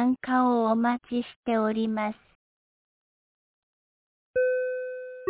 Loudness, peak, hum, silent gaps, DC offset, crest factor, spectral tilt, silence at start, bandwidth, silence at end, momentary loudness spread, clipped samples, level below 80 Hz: -27 LUFS; -14 dBFS; none; 1.36-1.43 s, 2.35-4.34 s; under 0.1%; 16 dB; -10 dB/octave; 0 s; 4 kHz; 0 s; 10 LU; under 0.1%; -68 dBFS